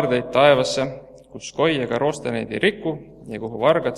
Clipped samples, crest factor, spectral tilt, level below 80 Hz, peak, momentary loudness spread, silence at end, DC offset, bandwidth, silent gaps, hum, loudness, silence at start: under 0.1%; 20 dB; -5 dB/octave; -54 dBFS; -2 dBFS; 18 LU; 0 s; under 0.1%; 12 kHz; none; none; -20 LUFS; 0 s